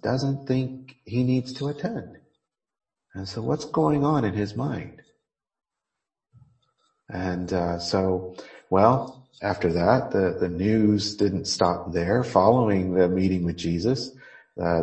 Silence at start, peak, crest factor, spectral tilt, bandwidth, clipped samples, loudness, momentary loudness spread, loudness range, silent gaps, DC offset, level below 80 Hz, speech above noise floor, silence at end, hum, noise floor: 0 s; -2 dBFS; 22 dB; -6.5 dB/octave; 8.8 kHz; under 0.1%; -24 LUFS; 14 LU; 8 LU; none; under 0.1%; -52 dBFS; 63 dB; 0 s; none; -87 dBFS